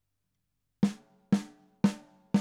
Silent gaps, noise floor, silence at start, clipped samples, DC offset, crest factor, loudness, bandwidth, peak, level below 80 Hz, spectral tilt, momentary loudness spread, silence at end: none; -82 dBFS; 0.8 s; under 0.1%; under 0.1%; 22 dB; -31 LUFS; 11.5 kHz; -10 dBFS; -70 dBFS; -7 dB/octave; 18 LU; 0 s